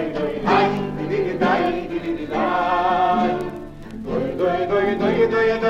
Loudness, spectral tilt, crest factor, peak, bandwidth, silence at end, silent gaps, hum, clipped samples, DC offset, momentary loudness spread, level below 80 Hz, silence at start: -20 LUFS; -7 dB/octave; 14 dB; -6 dBFS; 9.8 kHz; 0 s; none; none; under 0.1%; under 0.1%; 9 LU; -42 dBFS; 0 s